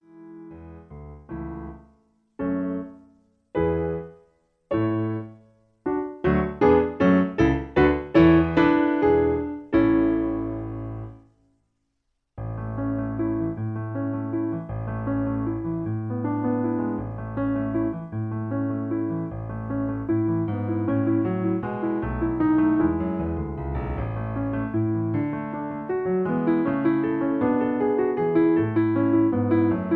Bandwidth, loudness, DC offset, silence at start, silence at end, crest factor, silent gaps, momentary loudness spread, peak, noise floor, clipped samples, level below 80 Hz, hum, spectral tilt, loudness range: 4.7 kHz; -24 LUFS; under 0.1%; 0.15 s; 0 s; 20 dB; none; 14 LU; -4 dBFS; -75 dBFS; under 0.1%; -42 dBFS; none; -10 dB/octave; 10 LU